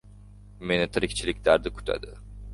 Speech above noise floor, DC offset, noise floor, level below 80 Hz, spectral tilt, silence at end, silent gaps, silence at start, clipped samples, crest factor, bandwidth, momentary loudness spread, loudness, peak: 22 dB; under 0.1%; -48 dBFS; -42 dBFS; -4.5 dB/octave; 0 s; none; 0.05 s; under 0.1%; 22 dB; 11.5 kHz; 16 LU; -26 LUFS; -6 dBFS